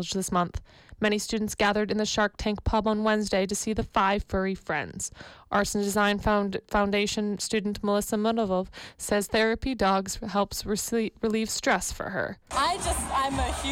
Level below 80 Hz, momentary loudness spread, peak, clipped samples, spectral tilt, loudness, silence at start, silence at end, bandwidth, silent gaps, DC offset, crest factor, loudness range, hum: -42 dBFS; 6 LU; -14 dBFS; under 0.1%; -4 dB/octave; -27 LUFS; 0 s; 0 s; 16.5 kHz; none; under 0.1%; 14 dB; 1 LU; none